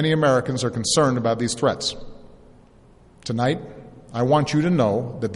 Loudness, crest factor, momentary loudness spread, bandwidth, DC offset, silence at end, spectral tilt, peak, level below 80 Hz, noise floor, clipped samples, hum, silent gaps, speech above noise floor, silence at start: -21 LUFS; 18 dB; 11 LU; 11.5 kHz; under 0.1%; 0 s; -5 dB/octave; -6 dBFS; -50 dBFS; -51 dBFS; under 0.1%; none; none; 30 dB; 0 s